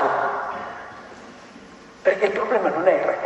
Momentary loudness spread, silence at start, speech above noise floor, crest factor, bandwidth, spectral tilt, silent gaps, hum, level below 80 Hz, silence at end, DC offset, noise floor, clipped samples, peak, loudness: 23 LU; 0 s; 24 dB; 18 dB; 8.4 kHz; -5.5 dB/octave; none; none; -62 dBFS; 0 s; under 0.1%; -44 dBFS; under 0.1%; -4 dBFS; -22 LUFS